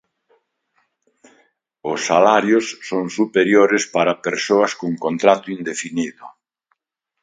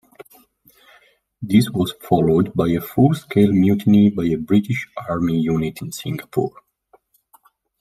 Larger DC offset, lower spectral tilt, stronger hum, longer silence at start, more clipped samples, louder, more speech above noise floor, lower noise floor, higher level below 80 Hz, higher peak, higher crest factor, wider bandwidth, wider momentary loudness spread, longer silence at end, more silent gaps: neither; second, -4 dB/octave vs -7.5 dB/octave; neither; first, 1.85 s vs 0.2 s; neither; about the same, -18 LUFS vs -19 LUFS; first, 60 dB vs 40 dB; first, -77 dBFS vs -58 dBFS; second, -68 dBFS vs -50 dBFS; about the same, 0 dBFS vs -2 dBFS; about the same, 20 dB vs 16 dB; second, 9.4 kHz vs 15 kHz; about the same, 12 LU vs 12 LU; second, 0.9 s vs 1.3 s; neither